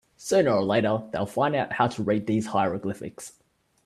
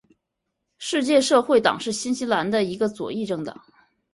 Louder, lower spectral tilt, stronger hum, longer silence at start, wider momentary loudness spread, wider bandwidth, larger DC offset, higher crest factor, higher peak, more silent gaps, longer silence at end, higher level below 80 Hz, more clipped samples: second, -25 LUFS vs -22 LUFS; first, -6 dB/octave vs -4 dB/octave; neither; second, 0.2 s vs 0.8 s; about the same, 14 LU vs 12 LU; first, 13.5 kHz vs 11.5 kHz; neither; about the same, 18 dB vs 20 dB; second, -6 dBFS vs -2 dBFS; neither; about the same, 0.55 s vs 0.6 s; about the same, -62 dBFS vs -64 dBFS; neither